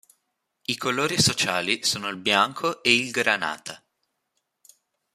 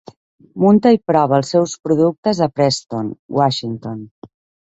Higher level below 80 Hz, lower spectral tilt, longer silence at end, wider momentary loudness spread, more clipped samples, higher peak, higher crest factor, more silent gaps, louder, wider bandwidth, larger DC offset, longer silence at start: second, -64 dBFS vs -56 dBFS; second, -2.5 dB/octave vs -6 dB/octave; first, 1.4 s vs 0.4 s; second, 10 LU vs 14 LU; neither; about the same, -2 dBFS vs -2 dBFS; first, 24 dB vs 16 dB; second, none vs 2.18-2.23 s, 3.19-3.29 s, 4.11-4.22 s; second, -22 LUFS vs -16 LUFS; first, 15 kHz vs 8.2 kHz; neither; first, 0.7 s vs 0.55 s